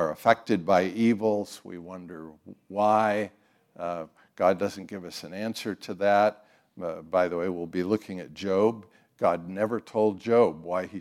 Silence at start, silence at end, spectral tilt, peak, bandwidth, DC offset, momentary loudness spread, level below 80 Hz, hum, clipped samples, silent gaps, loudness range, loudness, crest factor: 0 s; 0 s; -6 dB/octave; -4 dBFS; 15.5 kHz; under 0.1%; 16 LU; -74 dBFS; none; under 0.1%; none; 2 LU; -27 LUFS; 22 dB